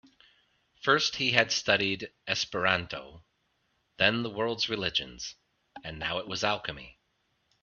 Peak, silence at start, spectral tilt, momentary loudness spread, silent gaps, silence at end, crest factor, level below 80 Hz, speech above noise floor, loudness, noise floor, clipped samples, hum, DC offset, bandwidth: -2 dBFS; 0.85 s; -3 dB/octave; 16 LU; none; 0.7 s; 30 dB; -62 dBFS; 45 dB; -28 LUFS; -75 dBFS; under 0.1%; none; under 0.1%; 7.2 kHz